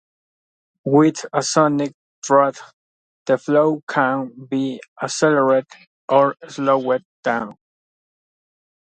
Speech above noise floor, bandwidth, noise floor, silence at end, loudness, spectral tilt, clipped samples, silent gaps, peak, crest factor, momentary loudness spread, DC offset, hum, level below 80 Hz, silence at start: over 72 dB; 9.4 kHz; under -90 dBFS; 1.3 s; -19 LUFS; -5 dB/octave; under 0.1%; 1.94-2.22 s, 2.73-3.26 s, 3.83-3.87 s, 4.88-4.96 s, 5.87-6.08 s, 7.05-7.23 s; -2 dBFS; 20 dB; 12 LU; under 0.1%; none; -70 dBFS; 0.85 s